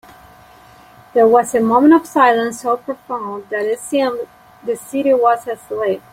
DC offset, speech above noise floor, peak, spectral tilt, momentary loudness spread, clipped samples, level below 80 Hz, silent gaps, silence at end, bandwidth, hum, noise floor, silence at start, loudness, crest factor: under 0.1%; 29 dB; -2 dBFS; -4.5 dB/octave; 13 LU; under 0.1%; -58 dBFS; none; 0.15 s; 16 kHz; none; -44 dBFS; 1.15 s; -16 LUFS; 16 dB